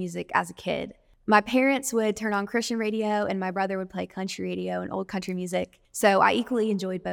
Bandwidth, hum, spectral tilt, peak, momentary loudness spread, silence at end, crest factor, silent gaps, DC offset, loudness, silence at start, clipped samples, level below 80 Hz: 19 kHz; none; -4.5 dB/octave; -4 dBFS; 11 LU; 0 s; 22 dB; none; under 0.1%; -26 LUFS; 0 s; under 0.1%; -62 dBFS